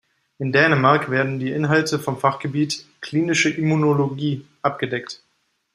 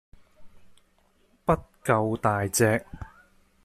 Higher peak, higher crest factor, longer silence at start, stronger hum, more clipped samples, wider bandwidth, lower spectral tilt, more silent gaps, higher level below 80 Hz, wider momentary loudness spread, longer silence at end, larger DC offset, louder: first, -2 dBFS vs -8 dBFS; about the same, 20 dB vs 22 dB; about the same, 0.4 s vs 0.4 s; neither; neither; about the same, 15 kHz vs 15 kHz; about the same, -5.5 dB/octave vs -5 dB/octave; neither; second, -62 dBFS vs -50 dBFS; second, 10 LU vs 21 LU; about the same, 0.6 s vs 0.6 s; neither; first, -20 LUFS vs -26 LUFS